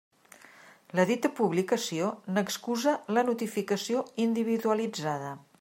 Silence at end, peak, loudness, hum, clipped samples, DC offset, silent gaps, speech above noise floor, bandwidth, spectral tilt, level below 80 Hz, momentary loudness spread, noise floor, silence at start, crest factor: 0.25 s; -10 dBFS; -29 LUFS; none; under 0.1%; under 0.1%; none; 26 dB; 16 kHz; -5 dB/octave; -80 dBFS; 6 LU; -55 dBFS; 0.65 s; 20 dB